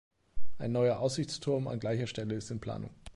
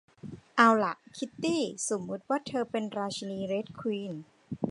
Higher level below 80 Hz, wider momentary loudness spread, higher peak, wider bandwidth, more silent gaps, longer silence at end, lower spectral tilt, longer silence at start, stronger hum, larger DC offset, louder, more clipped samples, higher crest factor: first, -54 dBFS vs -70 dBFS; second, 11 LU vs 18 LU; second, -18 dBFS vs -6 dBFS; about the same, 11.5 kHz vs 11.5 kHz; neither; about the same, 0 s vs 0 s; first, -6 dB/octave vs -4 dB/octave; second, 0.1 s vs 0.25 s; neither; neither; second, -34 LUFS vs -30 LUFS; neither; second, 14 dB vs 24 dB